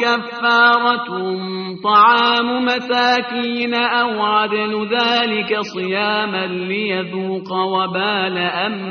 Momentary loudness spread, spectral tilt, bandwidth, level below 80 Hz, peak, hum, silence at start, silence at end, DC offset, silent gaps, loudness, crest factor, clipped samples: 10 LU; -1.5 dB/octave; 6.6 kHz; -64 dBFS; 0 dBFS; none; 0 s; 0 s; under 0.1%; none; -17 LUFS; 16 dB; under 0.1%